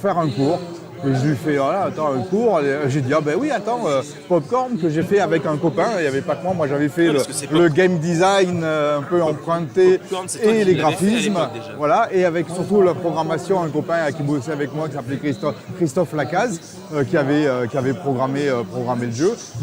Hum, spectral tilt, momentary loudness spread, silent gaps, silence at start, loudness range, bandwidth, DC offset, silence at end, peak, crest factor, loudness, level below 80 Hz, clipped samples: none; -6 dB/octave; 8 LU; none; 0 s; 4 LU; 16.5 kHz; under 0.1%; 0 s; -4 dBFS; 14 dB; -19 LUFS; -60 dBFS; under 0.1%